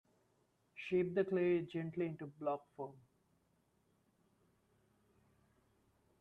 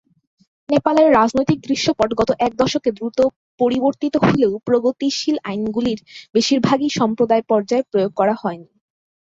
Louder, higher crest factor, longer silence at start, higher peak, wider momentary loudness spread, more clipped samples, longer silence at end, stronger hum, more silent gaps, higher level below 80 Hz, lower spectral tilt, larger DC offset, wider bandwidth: second, -39 LUFS vs -18 LUFS; about the same, 20 dB vs 16 dB; about the same, 0.75 s vs 0.7 s; second, -24 dBFS vs -2 dBFS; first, 15 LU vs 7 LU; neither; first, 3.2 s vs 0.7 s; neither; second, none vs 3.36-3.58 s, 6.29-6.33 s; second, -80 dBFS vs -52 dBFS; first, -8.5 dB/octave vs -5.5 dB/octave; neither; second, 5.6 kHz vs 7.8 kHz